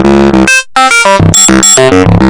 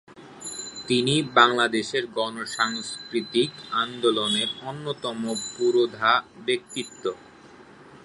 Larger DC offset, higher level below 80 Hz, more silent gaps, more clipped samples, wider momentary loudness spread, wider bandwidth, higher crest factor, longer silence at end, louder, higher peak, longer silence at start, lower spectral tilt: neither; first, -22 dBFS vs -66 dBFS; neither; first, 7% vs under 0.1%; second, 3 LU vs 13 LU; about the same, 12 kHz vs 11.5 kHz; second, 4 dB vs 24 dB; about the same, 0 s vs 0.05 s; first, -3 LUFS vs -24 LUFS; about the same, 0 dBFS vs -2 dBFS; about the same, 0 s vs 0.1 s; about the same, -3.5 dB/octave vs -3.5 dB/octave